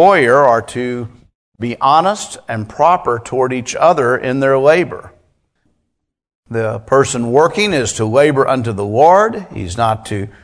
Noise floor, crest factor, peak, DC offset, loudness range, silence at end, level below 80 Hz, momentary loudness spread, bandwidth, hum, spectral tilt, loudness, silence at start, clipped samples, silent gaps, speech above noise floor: -71 dBFS; 14 dB; 0 dBFS; under 0.1%; 4 LU; 0.15 s; -48 dBFS; 14 LU; 11 kHz; none; -5 dB/octave; -14 LUFS; 0 s; 0.2%; 1.35-1.52 s, 6.35-6.43 s; 58 dB